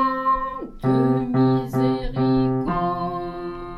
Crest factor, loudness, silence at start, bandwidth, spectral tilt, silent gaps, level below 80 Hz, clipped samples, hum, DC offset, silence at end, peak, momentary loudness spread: 12 dB; -22 LUFS; 0 s; 12.5 kHz; -9 dB/octave; none; -38 dBFS; under 0.1%; none; under 0.1%; 0 s; -8 dBFS; 9 LU